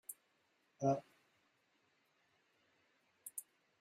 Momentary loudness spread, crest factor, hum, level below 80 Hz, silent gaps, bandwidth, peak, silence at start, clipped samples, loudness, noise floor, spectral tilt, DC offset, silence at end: 18 LU; 24 dB; none; -90 dBFS; none; 15.5 kHz; -24 dBFS; 0.1 s; under 0.1%; -42 LUFS; -79 dBFS; -6.5 dB/octave; under 0.1%; 0.4 s